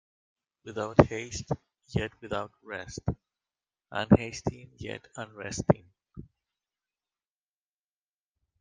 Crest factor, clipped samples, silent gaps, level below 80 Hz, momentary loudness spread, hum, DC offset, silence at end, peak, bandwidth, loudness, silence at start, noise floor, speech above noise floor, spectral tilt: 30 dB; under 0.1%; none; -52 dBFS; 19 LU; none; under 0.1%; 2.4 s; -2 dBFS; 9.6 kHz; -30 LUFS; 0.65 s; under -90 dBFS; over 61 dB; -6.5 dB/octave